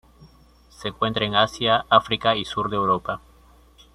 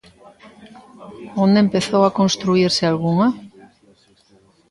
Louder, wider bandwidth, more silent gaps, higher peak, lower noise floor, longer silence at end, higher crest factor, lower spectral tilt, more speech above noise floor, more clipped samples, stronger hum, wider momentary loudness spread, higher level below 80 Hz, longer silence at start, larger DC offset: second, -21 LUFS vs -17 LUFS; first, 13 kHz vs 11.5 kHz; neither; about the same, -2 dBFS vs -2 dBFS; about the same, -53 dBFS vs -55 dBFS; second, 0.75 s vs 1.25 s; first, 22 dB vs 16 dB; about the same, -5 dB/octave vs -5.5 dB/octave; second, 31 dB vs 38 dB; neither; neither; first, 14 LU vs 10 LU; first, -52 dBFS vs -58 dBFS; second, 0.2 s vs 0.6 s; neither